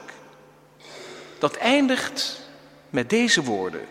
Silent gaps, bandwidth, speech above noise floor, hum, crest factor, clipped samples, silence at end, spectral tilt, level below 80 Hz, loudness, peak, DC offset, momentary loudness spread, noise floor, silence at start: none; 16 kHz; 29 dB; none; 20 dB; under 0.1%; 0 s; -3 dB/octave; -66 dBFS; -22 LUFS; -4 dBFS; under 0.1%; 22 LU; -52 dBFS; 0 s